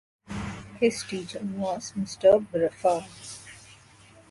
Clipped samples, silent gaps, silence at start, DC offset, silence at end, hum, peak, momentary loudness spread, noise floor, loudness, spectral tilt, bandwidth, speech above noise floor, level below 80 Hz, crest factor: under 0.1%; none; 0.3 s; under 0.1%; 0.55 s; none; -8 dBFS; 20 LU; -54 dBFS; -27 LUFS; -5 dB/octave; 11.5 kHz; 28 dB; -56 dBFS; 20 dB